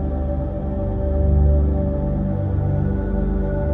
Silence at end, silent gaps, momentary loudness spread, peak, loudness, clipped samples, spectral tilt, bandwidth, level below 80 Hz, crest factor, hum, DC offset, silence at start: 0 s; none; 7 LU; -6 dBFS; -21 LUFS; under 0.1%; -12.5 dB/octave; 2.3 kHz; -22 dBFS; 12 dB; none; under 0.1%; 0 s